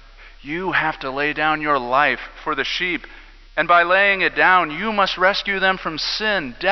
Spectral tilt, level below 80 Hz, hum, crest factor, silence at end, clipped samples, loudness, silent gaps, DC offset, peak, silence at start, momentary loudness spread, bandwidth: -4 dB/octave; -46 dBFS; none; 18 dB; 0 s; under 0.1%; -18 LUFS; none; under 0.1%; -2 dBFS; 0.2 s; 9 LU; 6.2 kHz